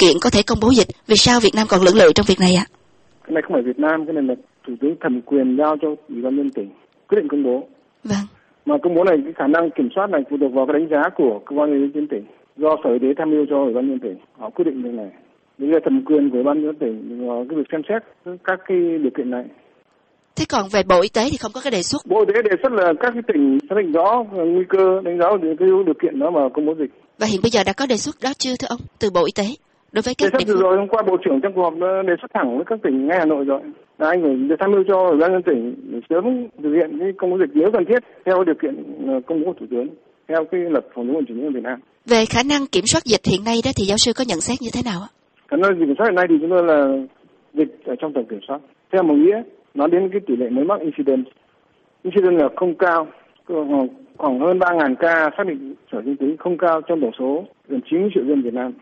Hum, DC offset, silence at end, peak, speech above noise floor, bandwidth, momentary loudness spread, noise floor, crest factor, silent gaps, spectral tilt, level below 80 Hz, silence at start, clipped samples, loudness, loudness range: none; under 0.1%; 0.05 s; -2 dBFS; 42 dB; 8.8 kHz; 11 LU; -60 dBFS; 18 dB; none; -4.5 dB/octave; -48 dBFS; 0 s; under 0.1%; -18 LUFS; 4 LU